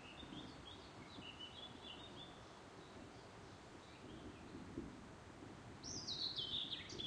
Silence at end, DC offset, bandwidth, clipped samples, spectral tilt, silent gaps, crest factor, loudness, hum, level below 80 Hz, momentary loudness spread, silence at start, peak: 0 s; under 0.1%; 10.5 kHz; under 0.1%; -3 dB/octave; none; 20 dB; -50 LUFS; none; -68 dBFS; 15 LU; 0 s; -32 dBFS